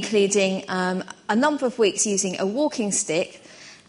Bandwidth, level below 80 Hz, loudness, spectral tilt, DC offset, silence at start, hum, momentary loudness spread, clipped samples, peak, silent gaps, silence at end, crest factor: 11 kHz; -70 dBFS; -23 LUFS; -3.5 dB/octave; under 0.1%; 0 s; none; 6 LU; under 0.1%; -6 dBFS; none; 0.15 s; 16 dB